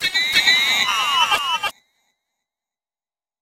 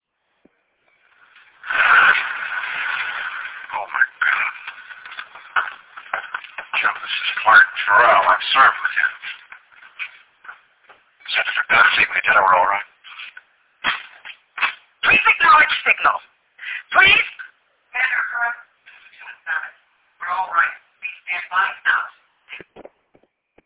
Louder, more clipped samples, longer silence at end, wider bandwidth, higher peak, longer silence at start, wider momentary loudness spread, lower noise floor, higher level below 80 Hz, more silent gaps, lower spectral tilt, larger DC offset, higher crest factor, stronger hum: about the same, -16 LUFS vs -17 LUFS; neither; first, 1.7 s vs 0.85 s; first, over 20 kHz vs 4 kHz; first, 0 dBFS vs -4 dBFS; second, 0 s vs 1.65 s; second, 9 LU vs 23 LU; first, under -90 dBFS vs -64 dBFS; about the same, -58 dBFS vs -60 dBFS; neither; second, 1.5 dB/octave vs -4.5 dB/octave; neither; about the same, 22 dB vs 18 dB; neither